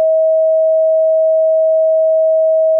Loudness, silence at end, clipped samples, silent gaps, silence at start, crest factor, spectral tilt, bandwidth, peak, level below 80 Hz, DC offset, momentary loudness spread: -12 LUFS; 0 s; under 0.1%; none; 0 s; 4 dB; -7 dB/octave; 0.8 kHz; -8 dBFS; under -90 dBFS; under 0.1%; 0 LU